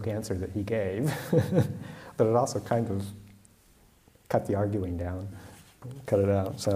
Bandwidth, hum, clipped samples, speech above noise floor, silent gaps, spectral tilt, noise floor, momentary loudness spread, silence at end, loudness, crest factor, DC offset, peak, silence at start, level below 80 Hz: 15.5 kHz; none; under 0.1%; 32 dB; none; -7 dB/octave; -60 dBFS; 17 LU; 0 s; -29 LUFS; 18 dB; under 0.1%; -10 dBFS; 0 s; -56 dBFS